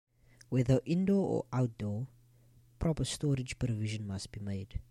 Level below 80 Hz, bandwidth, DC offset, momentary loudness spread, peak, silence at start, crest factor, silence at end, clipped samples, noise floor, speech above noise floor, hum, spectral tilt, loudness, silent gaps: -50 dBFS; 12.5 kHz; under 0.1%; 11 LU; -16 dBFS; 0.5 s; 18 dB; 0.05 s; under 0.1%; -63 dBFS; 30 dB; none; -6.5 dB/octave; -34 LUFS; none